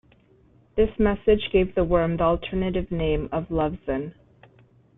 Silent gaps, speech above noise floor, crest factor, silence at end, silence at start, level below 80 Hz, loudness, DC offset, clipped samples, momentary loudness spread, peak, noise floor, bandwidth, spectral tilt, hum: none; 35 dB; 18 dB; 0.85 s; 0.75 s; -38 dBFS; -24 LUFS; under 0.1%; under 0.1%; 9 LU; -6 dBFS; -57 dBFS; 4 kHz; -11 dB/octave; none